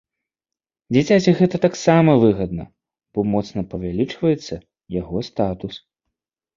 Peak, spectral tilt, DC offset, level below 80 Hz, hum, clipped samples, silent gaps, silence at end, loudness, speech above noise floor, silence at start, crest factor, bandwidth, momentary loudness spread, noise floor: -2 dBFS; -7 dB/octave; under 0.1%; -46 dBFS; none; under 0.1%; none; 0.8 s; -19 LUFS; 70 dB; 0.9 s; 18 dB; 7.6 kHz; 16 LU; -89 dBFS